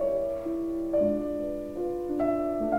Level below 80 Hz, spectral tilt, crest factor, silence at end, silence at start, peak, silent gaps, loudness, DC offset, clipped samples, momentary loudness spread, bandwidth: -50 dBFS; -8.5 dB/octave; 14 dB; 0 s; 0 s; -14 dBFS; none; -29 LUFS; under 0.1%; under 0.1%; 6 LU; 16 kHz